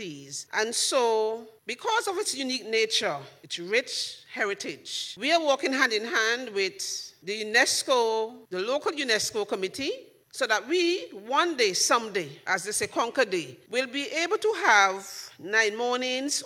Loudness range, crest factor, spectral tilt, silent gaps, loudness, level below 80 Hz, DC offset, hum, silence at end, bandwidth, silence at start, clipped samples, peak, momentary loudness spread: 3 LU; 20 dB; -1 dB/octave; none; -26 LUFS; -76 dBFS; under 0.1%; none; 0 s; 16 kHz; 0 s; under 0.1%; -6 dBFS; 11 LU